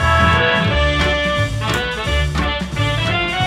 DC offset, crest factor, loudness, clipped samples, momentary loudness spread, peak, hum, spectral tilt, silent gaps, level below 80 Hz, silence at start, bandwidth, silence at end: under 0.1%; 14 dB; -17 LUFS; under 0.1%; 6 LU; -2 dBFS; none; -5 dB/octave; none; -26 dBFS; 0 s; 15 kHz; 0 s